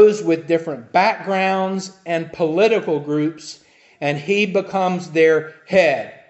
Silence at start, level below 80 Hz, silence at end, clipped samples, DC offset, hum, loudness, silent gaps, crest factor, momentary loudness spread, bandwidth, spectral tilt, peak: 0 s; -66 dBFS; 0.15 s; under 0.1%; under 0.1%; none; -19 LUFS; none; 16 dB; 9 LU; 8.4 kHz; -5.5 dB/octave; -2 dBFS